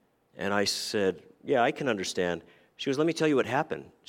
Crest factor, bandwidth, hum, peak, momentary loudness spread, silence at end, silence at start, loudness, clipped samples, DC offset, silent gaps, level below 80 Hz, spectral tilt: 18 dB; 16.5 kHz; none; -10 dBFS; 10 LU; 0.2 s; 0.4 s; -29 LUFS; under 0.1%; under 0.1%; none; -70 dBFS; -4 dB/octave